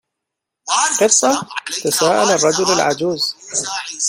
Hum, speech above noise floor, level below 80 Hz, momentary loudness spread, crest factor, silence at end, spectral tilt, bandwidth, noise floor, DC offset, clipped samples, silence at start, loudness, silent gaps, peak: none; 64 dB; -60 dBFS; 9 LU; 18 dB; 0 s; -1.5 dB/octave; 16.5 kHz; -80 dBFS; under 0.1%; under 0.1%; 0.65 s; -16 LUFS; none; 0 dBFS